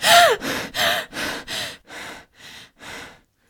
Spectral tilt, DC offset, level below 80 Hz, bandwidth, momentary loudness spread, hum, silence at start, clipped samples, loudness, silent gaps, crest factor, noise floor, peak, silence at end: -1 dB/octave; under 0.1%; -54 dBFS; over 20 kHz; 25 LU; none; 0 s; under 0.1%; -20 LUFS; none; 22 dB; -44 dBFS; 0 dBFS; 0.4 s